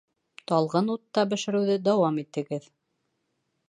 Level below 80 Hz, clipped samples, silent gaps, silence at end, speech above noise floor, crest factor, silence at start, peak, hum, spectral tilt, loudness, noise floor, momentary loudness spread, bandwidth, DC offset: -78 dBFS; under 0.1%; none; 1.1 s; 51 dB; 18 dB; 0.5 s; -10 dBFS; none; -6 dB/octave; -26 LUFS; -77 dBFS; 11 LU; 10.5 kHz; under 0.1%